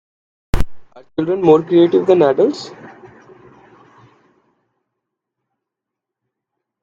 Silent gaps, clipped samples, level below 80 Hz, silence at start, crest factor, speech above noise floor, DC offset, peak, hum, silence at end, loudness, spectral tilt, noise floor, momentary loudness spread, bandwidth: none; under 0.1%; -34 dBFS; 0.55 s; 18 dB; 69 dB; under 0.1%; 0 dBFS; none; 3.95 s; -15 LUFS; -7.5 dB/octave; -83 dBFS; 17 LU; 10.5 kHz